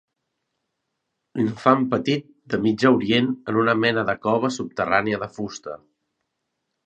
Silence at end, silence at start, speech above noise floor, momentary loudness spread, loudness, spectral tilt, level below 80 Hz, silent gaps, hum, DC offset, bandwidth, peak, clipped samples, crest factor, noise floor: 1.1 s; 1.35 s; 57 dB; 13 LU; -22 LUFS; -6 dB/octave; -60 dBFS; none; none; under 0.1%; 8.8 kHz; 0 dBFS; under 0.1%; 22 dB; -78 dBFS